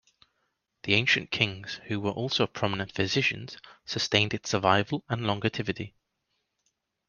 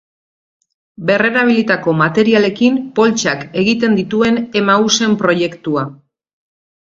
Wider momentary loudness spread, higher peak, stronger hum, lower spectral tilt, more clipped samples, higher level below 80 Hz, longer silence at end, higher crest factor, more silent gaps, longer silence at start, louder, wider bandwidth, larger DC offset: first, 14 LU vs 6 LU; second, -4 dBFS vs 0 dBFS; neither; about the same, -4.5 dB/octave vs -4.5 dB/octave; neither; second, -62 dBFS vs -54 dBFS; first, 1.2 s vs 1 s; first, 24 dB vs 14 dB; neither; second, 0.85 s vs 1 s; second, -27 LUFS vs -14 LUFS; first, 9.8 kHz vs 7.6 kHz; neither